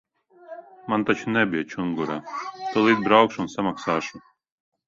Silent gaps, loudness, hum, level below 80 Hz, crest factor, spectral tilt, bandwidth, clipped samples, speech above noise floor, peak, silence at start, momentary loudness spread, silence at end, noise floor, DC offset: none; -23 LUFS; none; -62 dBFS; 24 dB; -5.5 dB/octave; 7.6 kHz; under 0.1%; 22 dB; 0 dBFS; 0.5 s; 18 LU; 0.7 s; -45 dBFS; under 0.1%